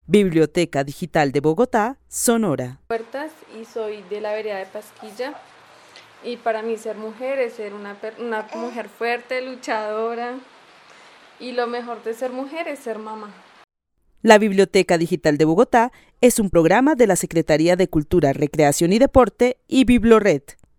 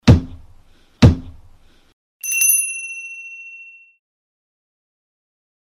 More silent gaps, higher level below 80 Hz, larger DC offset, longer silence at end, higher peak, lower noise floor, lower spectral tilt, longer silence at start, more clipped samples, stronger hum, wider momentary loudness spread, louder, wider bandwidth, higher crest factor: second, none vs 1.93-2.20 s; second, -44 dBFS vs -32 dBFS; neither; second, 0.25 s vs 2.2 s; about the same, 0 dBFS vs 0 dBFS; first, -60 dBFS vs -48 dBFS; about the same, -5 dB/octave vs -4.5 dB/octave; about the same, 0.1 s vs 0.05 s; neither; neither; second, 16 LU vs 22 LU; second, -19 LUFS vs -16 LUFS; second, 18 kHz vs over 20 kHz; about the same, 20 dB vs 20 dB